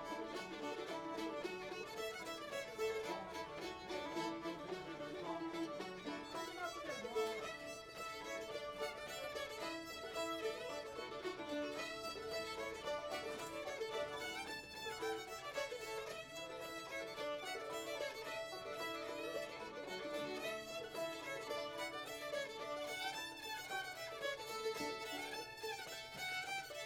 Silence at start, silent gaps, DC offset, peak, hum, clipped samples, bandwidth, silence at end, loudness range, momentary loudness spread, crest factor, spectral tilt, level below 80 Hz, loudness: 0 s; none; under 0.1%; -30 dBFS; none; under 0.1%; 18 kHz; 0 s; 1 LU; 4 LU; 16 dB; -2.5 dB/octave; -74 dBFS; -45 LUFS